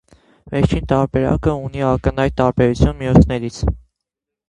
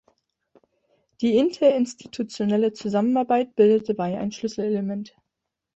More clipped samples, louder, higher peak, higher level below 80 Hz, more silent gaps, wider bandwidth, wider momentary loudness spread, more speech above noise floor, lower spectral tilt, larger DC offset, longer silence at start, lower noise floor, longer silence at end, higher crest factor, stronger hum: neither; first, -17 LUFS vs -23 LUFS; first, 0 dBFS vs -6 dBFS; first, -26 dBFS vs -66 dBFS; neither; first, 10.5 kHz vs 8.2 kHz; second, 9 LU vs 12 LU; first, 66 dB vs 60 dB; first, -8 dB/octave vs -6.5 dB/octave; neither; second, 0.45 s vs 1.2 s; about the same, -82 dBFS vs -82 dBFS; about the same, 0.7 s vs 0.65 s; about the same, 18 dB vs 18 dB; neither